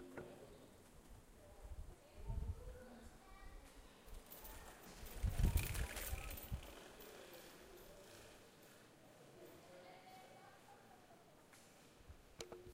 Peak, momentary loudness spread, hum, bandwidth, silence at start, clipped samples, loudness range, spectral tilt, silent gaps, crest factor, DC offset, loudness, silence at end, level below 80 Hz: -24 dBFS; 18 LU; none; 16 kHz; 0 s; under 0.1%; 15 LU; -4.5 dB/octave; none; 26 dB; under 0.1%; -51 LUFS; 0 s; -52 dBFS